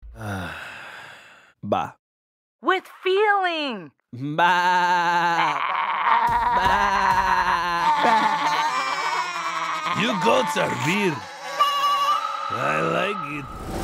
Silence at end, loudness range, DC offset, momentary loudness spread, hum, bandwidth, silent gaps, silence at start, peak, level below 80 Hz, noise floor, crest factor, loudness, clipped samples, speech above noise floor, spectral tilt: 0 s; 5 LU; under 0.1%; 13 LU; none; 16 kHz; 1.99-2.59 s; 0 s; -4 dBFS; -48 dBFS; -49 dBFS; 18 dB; -21 LUFS; under 0.1%; 27 dB; -4 dB/octave